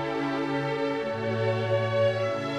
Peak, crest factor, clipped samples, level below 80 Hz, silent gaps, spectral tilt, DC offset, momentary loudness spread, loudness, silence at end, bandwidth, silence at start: -14 dBFS; 14 dB; under 0.1%; -62 dBFS; none; -7 dB/octave; under 0.1%; 4 LU; -27 LUFS; 0 s; 10 kHz; 0 s